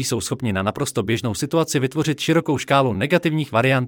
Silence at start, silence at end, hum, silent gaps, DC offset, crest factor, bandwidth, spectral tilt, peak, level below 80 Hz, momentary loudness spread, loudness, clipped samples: 0 s; 0 s; none; none; under 0.1%; 16 dB; 18.5 kHz; -5 dB/octave; -4 dBFS; -56 dBFS; 5 LU; -20 LUFS; under 0.1%